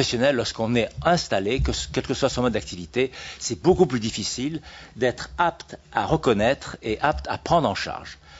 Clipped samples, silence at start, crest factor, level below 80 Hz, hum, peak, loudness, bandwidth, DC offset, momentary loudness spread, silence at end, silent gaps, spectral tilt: under 0.1%; 0 s; 20 dB; -40 dBFS; none; -4 dBFS; -24 LUFS; 8 kHz; under 0.1%; 9 LU; 0 s; none; -4.5 dB/octave